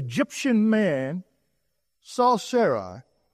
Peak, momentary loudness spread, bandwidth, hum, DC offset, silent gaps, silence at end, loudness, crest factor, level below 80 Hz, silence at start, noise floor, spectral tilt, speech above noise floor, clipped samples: -8 dBFS; 14 LU; 14 kHz; none; under 0.1%; none; 0.3 s; -23 LUFS; 16 dB; -70 dBFS; 0 s; -77 dBFS; -5.5 dB/octave; 54 dB; under 0.1%